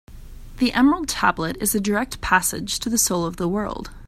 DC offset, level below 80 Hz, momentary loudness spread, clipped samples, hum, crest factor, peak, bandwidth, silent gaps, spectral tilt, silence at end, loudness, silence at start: under 0.1%; -40 dBFS; 6 LU; under 0.1%; none; 20 dB; -2 dBFS; 15.5 kHz; none; -3 dB/octave; 0 s; -21 LUFS; 0.1 s